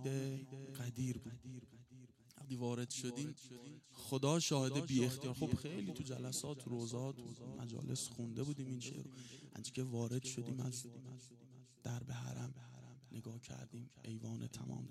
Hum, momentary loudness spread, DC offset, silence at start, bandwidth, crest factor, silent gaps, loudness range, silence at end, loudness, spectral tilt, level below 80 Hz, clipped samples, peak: none; 18 LU; under 0.1%; 0 s; 15 kHz; 22 dB; none; 9 LU; 0 s; -44 LUFS; -5 dB/octave; -74 dBFS; under 0.1%; -22 dBFS